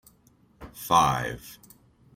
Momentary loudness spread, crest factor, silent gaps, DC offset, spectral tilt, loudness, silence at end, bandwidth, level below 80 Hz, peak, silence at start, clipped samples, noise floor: 25 LU; 22 dB; none; under 0.1%; -4 dB/octave; -24 LUFS; 0.6 s; 16.5 kHz; -52 dBFS; -6 dBFS; 0.6 s; under 0.1%; -61 dBFS